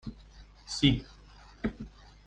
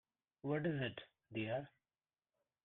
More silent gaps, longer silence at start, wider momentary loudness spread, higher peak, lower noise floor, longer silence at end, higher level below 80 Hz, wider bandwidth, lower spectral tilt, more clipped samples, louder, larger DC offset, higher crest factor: neither; second, 0.05 s vs 0.45 s; first, 24 LU vs 13 LU; first, -8 dBFS vs -26 dBFS; second, -54 dBFS vs under -90 dBFS; second, 0.4 s vs 0.95 s; first, -46 dBFS vs -78 dBFS; first, 9.8 kHz vs 4.1 kHz; second, -5 dB/octave vs -9 dB/octave; neither; first, -31 LUFS vs -43 LUFS; neither; first, 24 dB vs 18 dB